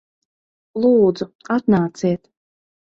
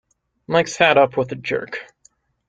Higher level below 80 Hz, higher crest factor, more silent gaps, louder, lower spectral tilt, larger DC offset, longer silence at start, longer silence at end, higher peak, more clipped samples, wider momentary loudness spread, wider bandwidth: about the same, -56 dBFS vs -60 dBFS; about the same, 16 dB vs 20 dB; first, 1.35-1.39 s vs none; about the same, -18 LUFS vs -18 LUFS; first, -8 dB/octave vs -4 dB/octave; neither; first, 0.75 s vs 0.5 s; first, 0.8 s vs 0.65 s; about the same, -4 dBFS vs -2 dBFS; neither; about the same, 14 LU vs 14 LU; second, 7.8 kHz vs 9 kHz